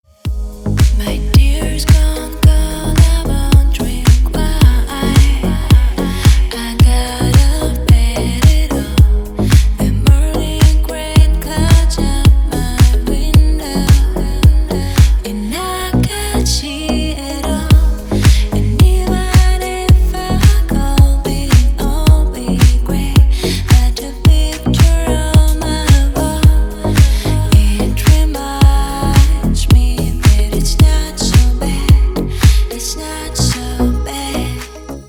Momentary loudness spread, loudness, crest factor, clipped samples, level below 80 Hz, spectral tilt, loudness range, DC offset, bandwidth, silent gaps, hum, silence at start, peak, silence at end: 6 LU; -13 LUFS; 10 dB; 0.1%; -12 dBFS; -5.5 dB/octave; 2 LU; under 0.1%; 18.5 kHz; none; none; 0.25 s; 0 dBFS; 0.05 s